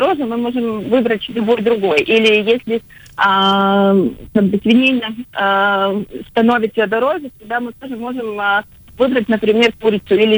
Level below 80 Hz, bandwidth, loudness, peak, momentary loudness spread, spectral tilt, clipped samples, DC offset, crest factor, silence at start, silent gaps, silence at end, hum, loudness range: -50 dBFS; over 20 kHz; -15 LUFS; -2 dBFS; 11 LU; -6 dB/octave; under 0.1%; under 0.1%; 14 dB; 0 s; none; 0 s; none; 4 LU